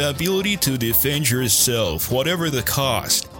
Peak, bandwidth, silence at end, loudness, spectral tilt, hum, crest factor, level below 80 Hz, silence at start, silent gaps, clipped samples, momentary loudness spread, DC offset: -4 dBFS; 17 kHz; 0 s; -19 LUFS; -3 dB/octave; none; 16 dB; -42 dBFS; 0 s; none; under 0.1%; 5 LU; under 0.1%